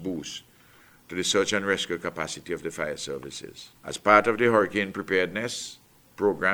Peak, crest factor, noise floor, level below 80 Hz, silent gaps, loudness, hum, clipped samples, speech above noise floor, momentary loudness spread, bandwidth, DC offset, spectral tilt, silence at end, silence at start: -2 dBFS; 24 dB; -56 dBFS; -62 dBFS; none; -26 LUFS; none; under 0.1%; 29 dB; 19 LU; over 20 kHz; under 0.1%; -3.5 dB/octave; 0 s; 0 s